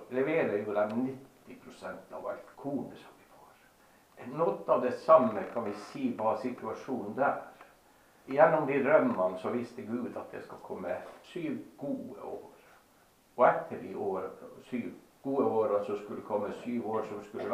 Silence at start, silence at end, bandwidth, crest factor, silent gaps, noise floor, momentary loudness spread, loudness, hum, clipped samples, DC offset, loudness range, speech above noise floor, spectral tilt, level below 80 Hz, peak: 0 s; 0 s; 15 kHz; 24 dB; none; -64 dBFS; 19 LU; -32 LUFS; none; under 0.1%; under 0.1%; 10 LU; 32 dB; -7 dB/octave; -76 dBFS; -8 dBFS